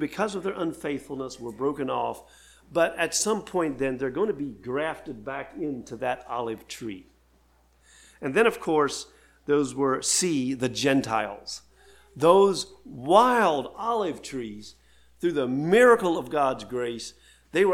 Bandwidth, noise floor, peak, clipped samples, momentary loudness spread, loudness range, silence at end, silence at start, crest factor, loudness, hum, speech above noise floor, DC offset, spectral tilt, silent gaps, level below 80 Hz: 16.5 kHz; -62 dBFS; -4 dBFS; under 0.1%; 17 LU; 8 LU; 0 s; 0 s; 22 dB; -25 LUFS; none; 36 dB; under 0.1%; -4 dB/octave; none; -60 dBFS